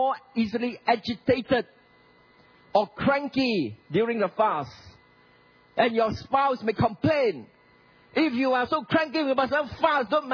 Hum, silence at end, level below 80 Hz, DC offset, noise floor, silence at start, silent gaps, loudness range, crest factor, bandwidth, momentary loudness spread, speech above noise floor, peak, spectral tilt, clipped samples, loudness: none; 0 s; -58 dBFS; under 0.1%; -58 dBFS; 0 s; none; 2 LU; 18 dB; 5.4 kHz; 5 LU; 33 dB; -8 dBFS; -7 dB/octave; under 0.1%; -25 LUFS